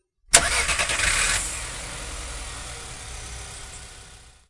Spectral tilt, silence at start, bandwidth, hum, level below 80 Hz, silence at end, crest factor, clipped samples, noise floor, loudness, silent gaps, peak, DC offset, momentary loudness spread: -0.5 dB/octave; 0.3 s; 12 kHz; none; -38 dBFS; 0.2 s; 26 dB; under 0.1%; -47 dBFS; -22 LUFS; none; 0 dBFS; under 0.1%; 20 LU